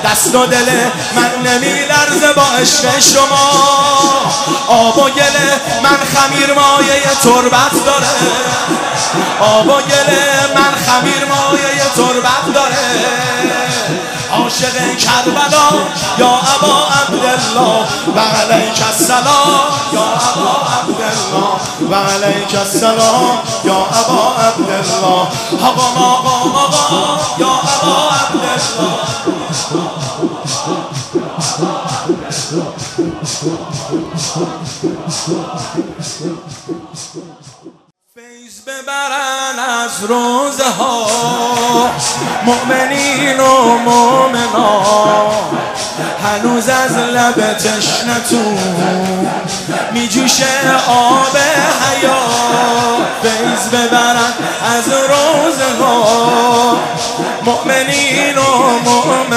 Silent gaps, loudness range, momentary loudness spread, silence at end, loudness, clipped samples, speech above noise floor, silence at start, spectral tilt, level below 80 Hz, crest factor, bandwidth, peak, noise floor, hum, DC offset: none; 9 LU; 10 LU; 0 s; -11 LUFS; under 0.1%; 34 dB; 0 s; -2.5 dB/octave; -50 dBFS; 12 dB; 16.5 kHz; 0 dBFS; -45 dBFS; none; under 0.1%